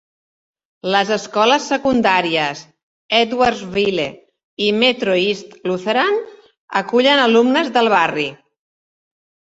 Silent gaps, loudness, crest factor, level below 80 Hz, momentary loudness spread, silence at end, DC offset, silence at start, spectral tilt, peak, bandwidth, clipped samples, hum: 2.83-3.09 s, 4.44-4.57 s, 6.58-6.68 s; -16 LUFS; 16 dB; -56 dBFS; 10 LU; 1.2 s; under 0.1%; 0.85 s; -4 dB/octave; 0 dBFS; 8 kHz; under 0.1%; none